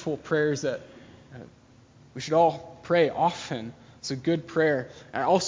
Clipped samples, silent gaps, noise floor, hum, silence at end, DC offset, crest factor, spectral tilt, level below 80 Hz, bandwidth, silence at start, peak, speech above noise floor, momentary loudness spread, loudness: under 0.1%; none; -54 dBFS; none; 0 s; under 0.1%; 18 dB; -5 dB/octave; -62 dBFS; 7.6 kHz; 0 s; -8 dBFS; 28 dB; 21 LU; -26 LUFS